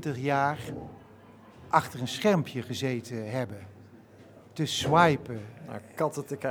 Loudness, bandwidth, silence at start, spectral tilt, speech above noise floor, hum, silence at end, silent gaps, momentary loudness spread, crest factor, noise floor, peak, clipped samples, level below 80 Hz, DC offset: -28 LUFS; over 20 kHz; 0 s; -5 dB/octave; 24 dB; none; 0 s; none; 19 LU; 24 dB; -53 dBFS; -6 dBFS; under 0.1%; -62 dBFS; under 0.1%